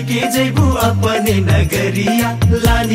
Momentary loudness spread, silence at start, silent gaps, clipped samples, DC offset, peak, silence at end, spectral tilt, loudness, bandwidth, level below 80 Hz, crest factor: 2 LU; 0 s; none; under 0.1%; under 0.1%; 0 dBFS; 0 s; -5.5 dB/octave; -14 LUFS; 16.5 kHz; -24 dBFS; 14 dB